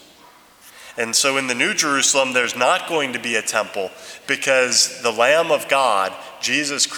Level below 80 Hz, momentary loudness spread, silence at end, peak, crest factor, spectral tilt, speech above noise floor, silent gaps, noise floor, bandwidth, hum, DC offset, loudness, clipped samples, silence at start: -70 dBFS; 10 LU; 0 s; -2 dBFS; 18 dB; -1 dB/octave; 29 dB; none; -48 dBFS; over 20 kHz; none; under 0.1%; -18 LUFS; under 0.1%; 0.65 s